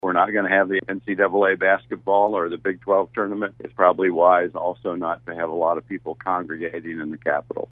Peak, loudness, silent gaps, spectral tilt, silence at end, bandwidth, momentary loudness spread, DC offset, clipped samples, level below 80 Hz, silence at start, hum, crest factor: -2 dBFS; -22 LUFS; none; -9 dB/octave; 0.05 s; 3.9 kHz; 11 LU; under 0.1%; under 0.1%; -62 dBFS; 0.05 s; none; 20 dB